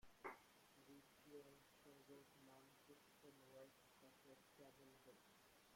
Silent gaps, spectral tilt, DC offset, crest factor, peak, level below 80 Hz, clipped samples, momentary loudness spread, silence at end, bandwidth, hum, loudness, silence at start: none; -3.5 dB/octave; under 0.1%; 26 dB; -40 dBFS; -88 dBFS; under 0.1%; 8 LU; 0 s; 16.5 kHz; none; -66 LUFS; 0 s